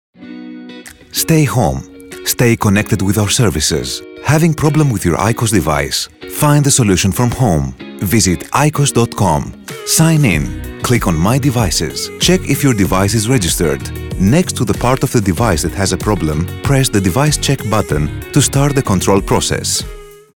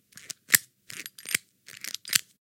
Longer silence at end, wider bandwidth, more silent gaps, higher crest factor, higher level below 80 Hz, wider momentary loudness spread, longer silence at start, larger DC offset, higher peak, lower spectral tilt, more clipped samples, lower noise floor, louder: about the same, 0.2 s vs 0.3 s; first, over 20 kHz vs 17 kHz; neither; second, 14 dB vs 32 dB; first, -30 dBFS vs -76 dBFS; second, 10 LU vs 19 LU; about the same, 0.2 s vs 0.15 s; first, 0.5% vs under 0.1%; about the same, 0 dBFS vs 0 dBFS; first, -4.5 dB/octave vs 1.5 dB/octave; neither; second, -34 dBFS vs -46 dBFS; first, -14 LUFS vs -26 LUFS